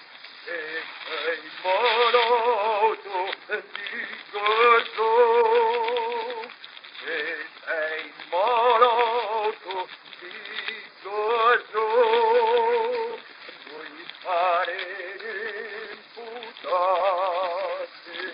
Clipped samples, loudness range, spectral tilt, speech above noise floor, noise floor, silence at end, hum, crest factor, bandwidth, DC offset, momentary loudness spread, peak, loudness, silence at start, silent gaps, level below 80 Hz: under 0.1%; 6 LU; -5.5 dB/octave; 18 dB; -44 dBFS; 0 s; none; 20 dB; 5.4 kHz; under 0.1%; 18 LU; -4 dBFS; -24 LUFS; 0 s; none; -88 dBFS